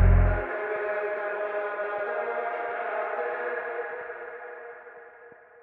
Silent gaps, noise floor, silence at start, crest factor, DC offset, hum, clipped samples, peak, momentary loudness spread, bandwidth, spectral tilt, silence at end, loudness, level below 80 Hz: none; -51 dBFS; 0 s; 18 dB; under 0.1%; none; under 0.1%; -10 dBFS; 17 LU; 3.9 kHz; -10.5 dB/octave; 0.3 s; -30 LUFS; -32 dBFS